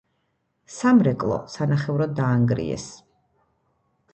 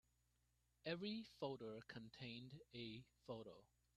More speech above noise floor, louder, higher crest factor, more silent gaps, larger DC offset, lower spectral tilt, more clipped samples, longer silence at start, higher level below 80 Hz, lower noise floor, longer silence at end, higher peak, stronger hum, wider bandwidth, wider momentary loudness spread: first, 51 dB vs 31 dB; first, -22 LUFS vs -54 LUFS; about the same, 18 dB vs 22 dB; neither; neither; about the same, -7.5 dB/octave vs -6.5 dB/octave; neither; second, 0.7 s vs 0.85 s; first, -54 dBFS vs -82 dBFS; second, -72 dBFS vs -84 dBFS; first, 1.2 s vs 0.3 s; first, -6 dBFS vs -34 dBFS; second, none vs 60 Hz at -75 dBFS; second, 8.6 kHz vs 13 kHz; first, 14 LU vs 10 LU